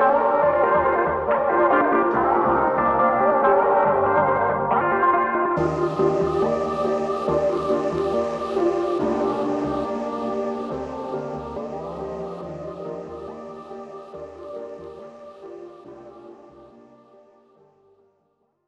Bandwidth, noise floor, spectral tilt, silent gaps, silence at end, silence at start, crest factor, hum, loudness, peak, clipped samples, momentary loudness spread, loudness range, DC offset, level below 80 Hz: 8.8 kHz; -68 dBFS; -7.5 dB/octave; none; 2 s; 0 s; 18 dB; none; -21 LUFS; -6 dBFS; under 0.1%; 19 LU; 19 LU; under 0.1%; -50 dBFS